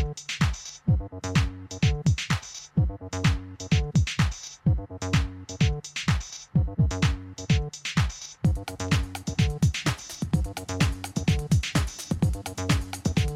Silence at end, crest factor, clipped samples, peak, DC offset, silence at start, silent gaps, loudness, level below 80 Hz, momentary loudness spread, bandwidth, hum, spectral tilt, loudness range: 0 s; 16 dB; under 0.1%; -10 dBFS; under 0.1%; 0 s; none; -27 LUFS; -34 dBFS; 6 LU; 14.5 kHz; none; -5 dB/octave; 1 LU